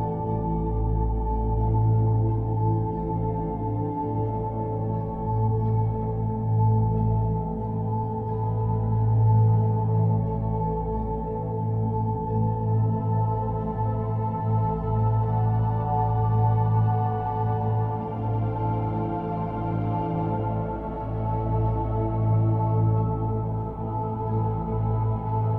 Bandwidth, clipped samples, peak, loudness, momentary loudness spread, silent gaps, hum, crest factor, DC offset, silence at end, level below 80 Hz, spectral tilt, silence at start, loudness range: 3 kHz; under 0.1%; -10 dBFS; -25 LUFS; 6 LU; none; none; 14 dB; under 0.1%; 0 s; -36 dBFS; -12.5 dB/octave; 0 s; 3 LU